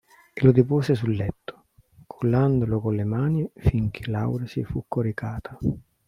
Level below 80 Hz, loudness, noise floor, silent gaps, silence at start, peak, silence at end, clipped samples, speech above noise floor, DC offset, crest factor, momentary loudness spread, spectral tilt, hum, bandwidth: -44 dBFS; -24 LUFS; -55 dBFS; none; 0.35 s; -4 dBFS; 0.3 s; under 0.1%; 32 dB; under 0.1%; 20 dB; 11 LU; -9.5 dB/octave; none; 11 kHz